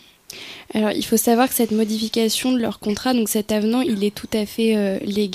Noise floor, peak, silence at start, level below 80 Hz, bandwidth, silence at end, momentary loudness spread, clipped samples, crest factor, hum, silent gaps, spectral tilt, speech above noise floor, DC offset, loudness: -39 dBFS; -4 dBFS; 0.3 s; -54 dBFS; 15.5 kHz; 0 s; 8 LU; under 0.1%; 16 dB; none; none; -4 dB/octave; 20 dB; under 0.1%; -20 LUFS